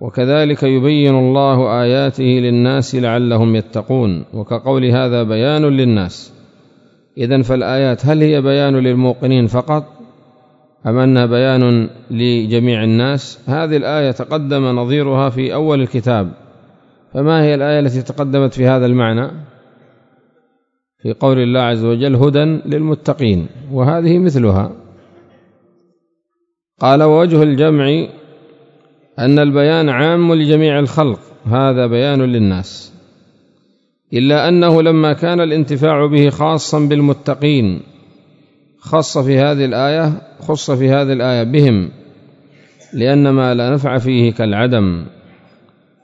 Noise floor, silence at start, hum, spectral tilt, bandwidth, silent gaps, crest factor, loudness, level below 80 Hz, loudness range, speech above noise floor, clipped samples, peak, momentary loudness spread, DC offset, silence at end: -70 dBFS; 0 s; none; -7.5 dB/octave; 7.8 kHz; none; 14 dB; -13 LUFS; -50 dBFS; 4 LU; 58 dB; under 0.1%; 0 dBFS; 8 LU; under 0.1%; 0.95 s